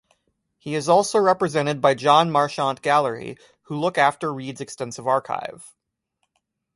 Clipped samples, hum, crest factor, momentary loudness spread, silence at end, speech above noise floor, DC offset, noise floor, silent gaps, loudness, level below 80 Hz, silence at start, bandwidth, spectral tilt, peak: under 0.1%; none; 20 dB; 16 LU; 1.1 s; 54 dB; under 0.1%; -76 dBFS; none; -21 LUFS; -66 dBFS; 0.65 s; 11.5 kHz; -4.5 dB/octave; -2 dBFS